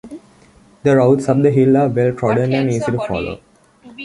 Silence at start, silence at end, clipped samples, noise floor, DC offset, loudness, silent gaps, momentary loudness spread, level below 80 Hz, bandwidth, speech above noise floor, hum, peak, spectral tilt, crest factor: 0.05 s; 0 s; under 0.1%; -48 dBFS; under 0.1%; -15 LUFS; none; 10 LU; -48 dBFS; 11.5 kHz; 34 dB; none; -2 dBFS; -8 dB/octave; 14 dB